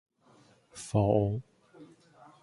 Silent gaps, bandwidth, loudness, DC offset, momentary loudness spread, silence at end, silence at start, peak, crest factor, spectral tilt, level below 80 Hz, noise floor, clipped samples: none; 11.5 kHz; -29 LUFS; under 0.1%; 19 LU; 0.55 s; 0.75 s; -12 dBFS; 22 dB; -7.5 dB/octave; -54 dBFS; -62 dBFS; under 0.1%